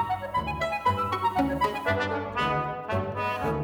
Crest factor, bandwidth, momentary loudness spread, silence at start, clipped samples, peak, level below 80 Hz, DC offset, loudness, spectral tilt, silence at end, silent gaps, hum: 16 dB; over 20 kHz; 4 LU; 0 s; under 0.1%; -12 dBFS; -48 dBFS; under 0.1%; -28 LUFS; -6 dB/octave; 0 s; none; none